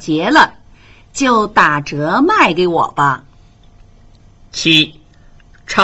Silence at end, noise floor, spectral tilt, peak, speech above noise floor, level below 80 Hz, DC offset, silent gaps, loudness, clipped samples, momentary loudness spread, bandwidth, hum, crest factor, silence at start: 0 s; -44 dBFS; -4 dB/octave; 0 dBFS; 31 dB; -44 dBFS; under 0.1%; none; -13 LUFS; under 0.1%; 8 LU; 10 kHz; none; 16 dB; 0 s